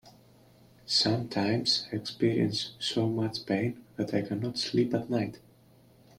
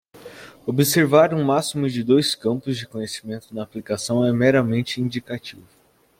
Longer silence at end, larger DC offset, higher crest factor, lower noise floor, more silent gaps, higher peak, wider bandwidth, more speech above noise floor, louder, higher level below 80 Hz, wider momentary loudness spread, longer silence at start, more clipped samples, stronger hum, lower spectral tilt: first, 0.8 s vs 0.6 s; neither; about the same, 16 dB vs 18 dB; first, -59 dBFS vs -42 dBFS; neither; second, -14 dBFS vs -4 dBFS; about the same, 15.5 kHz vs 16.5 kHz; first, 30 dB vs 22 dB; second, -29 LUFS vs -21 LUFS; second, -66 dBFS vs -60 dBFS; second, 7 LU vs 16 LU; about the same, 0.05 s vs 0.15 s; neither; neither; about the same, -5 dB/octave vs -5 dB/octave